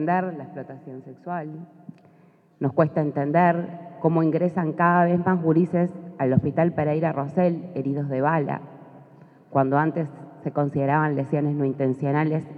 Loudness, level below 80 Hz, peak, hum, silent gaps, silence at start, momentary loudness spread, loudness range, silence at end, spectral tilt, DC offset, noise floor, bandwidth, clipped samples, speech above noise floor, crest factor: -23 LUFS; -68 dBFS; -6 dBFS; none; none; 0 s; 16 LU; 4 LU; 0 s; -11 dB/octave; under 0.1%; -56 dBFS; 4.8 kHz; under 0.1%; 33 dB; 18 dB